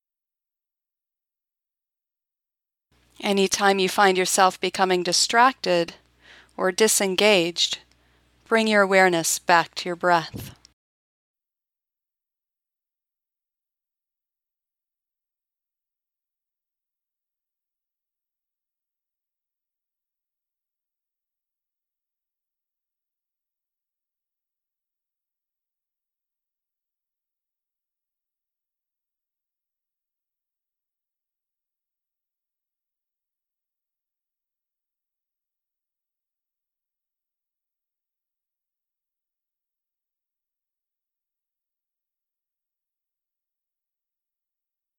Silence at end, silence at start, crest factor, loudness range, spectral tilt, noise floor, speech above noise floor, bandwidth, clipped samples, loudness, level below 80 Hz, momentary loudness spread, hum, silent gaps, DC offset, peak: 34.5 s; 3.2 s; 26 dB; 8 LU; -2.5 dB/octave; -90 dBFS; 69 dB; 17.5 kHz; under 0.1%; -20 LUFS; -70 dBFS; 9 LU; none; none; under 0.1%; -4 dBFS